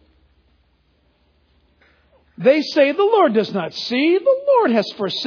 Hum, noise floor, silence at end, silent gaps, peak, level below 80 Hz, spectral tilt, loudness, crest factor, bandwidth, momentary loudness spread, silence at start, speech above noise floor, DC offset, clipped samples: none; -61 dBFS; 0 s; none; -2 dBFS; -64 dBFS; -5.5 dB/octave; -17 LUFS; 16 dB; 5.4 kHz; 7 LU; 2.35 s; 44 dB; under 0.1%; under 0.1%